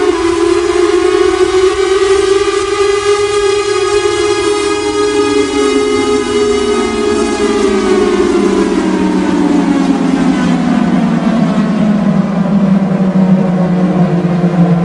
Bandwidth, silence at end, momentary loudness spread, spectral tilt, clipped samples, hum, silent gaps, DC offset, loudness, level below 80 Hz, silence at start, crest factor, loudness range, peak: 11 kHz; 0 s; 2 LU; -6 dB/octave; under 0.1%; none; none; under 0.1%; -11 LUFS; -36 dBFS; 0 s; 10 dB; 1 LU; 0 dBFS